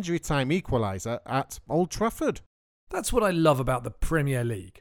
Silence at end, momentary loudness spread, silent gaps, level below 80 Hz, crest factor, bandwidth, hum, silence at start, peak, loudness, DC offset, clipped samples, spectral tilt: 0 s; 9 LU; 2.46-2.87 s; -40 dBFS; 20 dB; 19 kHz; none; 0 s; -8 dBFS; -27 LUFS; under 0.1%; under 0.1%; -5.5 dB/octave